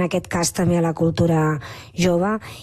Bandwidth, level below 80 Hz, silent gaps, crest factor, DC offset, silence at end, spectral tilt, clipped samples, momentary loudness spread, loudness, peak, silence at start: 13 kHz; -46 dBFS; none; 14 dB; under 0.1%; 0 s; -5.5 dB/octave; under 0.1%; 5 LU; -20 LUFS; -6 dBFS; 0 s